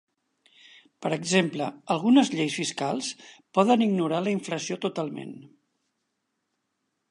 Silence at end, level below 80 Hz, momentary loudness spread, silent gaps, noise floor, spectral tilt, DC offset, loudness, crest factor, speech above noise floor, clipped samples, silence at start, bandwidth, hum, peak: 1.65 s; -78 dBFS; 14 LU; none; -79 dBFS; -5 dB/octave; under 0.1%; -26 LUFS; 20 dB; 53 dB; under 0.1%; 1 s; 11.5 kHz; none; -6 dBFS